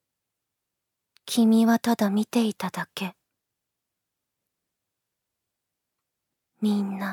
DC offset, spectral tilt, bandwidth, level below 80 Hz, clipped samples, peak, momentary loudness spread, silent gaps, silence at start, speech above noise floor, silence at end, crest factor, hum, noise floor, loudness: under 0.1%; -5.5 dB/octave; 17.5 kHz; -80 dBFS; under 0.1%; -8 dBFS; 13 LU; none; 1.25 s; 61 dB; 0 s; 20 dB; none; -84 dBFS; -24 LUFS